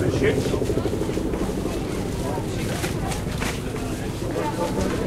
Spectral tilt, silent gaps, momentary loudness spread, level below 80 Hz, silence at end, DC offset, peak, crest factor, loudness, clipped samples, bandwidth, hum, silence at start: -5.5 dB/octave; none; 6 LU; -34 dBFS; 0 s; under 0.1%; -10 dBFS; 16 dB; -26 LUFS; under 0.1%; 16 kHz; none; 0 s